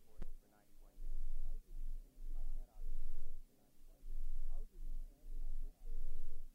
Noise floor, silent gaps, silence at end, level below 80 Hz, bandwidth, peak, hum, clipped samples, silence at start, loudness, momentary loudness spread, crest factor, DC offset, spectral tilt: -60 dBFS; none; 0.05 s; -40 dBFS; 0.8 kHz; -28 dBFS; none; under 0.1%; 0.05 s; -53 LUFS; 11 LU; 10 dB; under 0.1%; -6.5 dB/octave